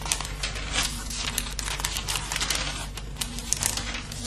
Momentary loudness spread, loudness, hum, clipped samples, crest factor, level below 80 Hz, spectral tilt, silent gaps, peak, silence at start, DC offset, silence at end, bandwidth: 7 LU; -28 LUFS; none; under 0.1%; 30 dB; -36 dBFS; -1.5 dB/octave; none; 0 dBFS; 0 s; under 0.1%; 0 s; 13.5 kHz